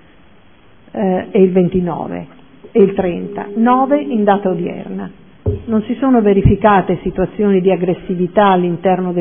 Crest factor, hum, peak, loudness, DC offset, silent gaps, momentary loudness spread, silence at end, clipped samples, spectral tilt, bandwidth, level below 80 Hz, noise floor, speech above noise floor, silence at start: 14 dB; none; 0 dBFS; -15 LUFS; 0.5%; none; 12 LU; 0 s; under 0.1%; -12 dB/octave; 3.6 kHz; -34 dBFS; -47 dBFS; 34 dB; 0.95 s